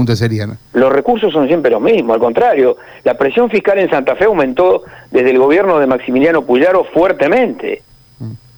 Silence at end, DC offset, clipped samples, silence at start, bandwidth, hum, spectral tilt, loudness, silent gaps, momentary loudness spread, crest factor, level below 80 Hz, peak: 0.2 s; under 0.1%; under 0.1%; 0 s; over 20 kHz; none; -7.5 dB/octave; -12 LUFS; none; 7 LU; 8 dB; -46 dBFS; -2 dBFS